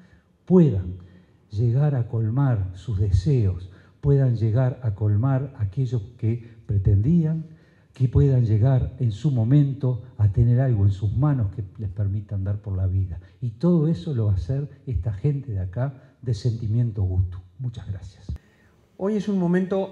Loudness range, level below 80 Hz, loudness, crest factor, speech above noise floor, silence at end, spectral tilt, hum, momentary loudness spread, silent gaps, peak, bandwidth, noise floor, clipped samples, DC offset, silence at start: 6 LU; -40 dBFS; -23 LUFS; 18 dB; 36 dB; 0 s; -10 dB/octave; none; 13 LU; none; -6 dBFS; 7.2 kHz; -58 dBFS; under 0.1%; under 0.1%; 0.5 s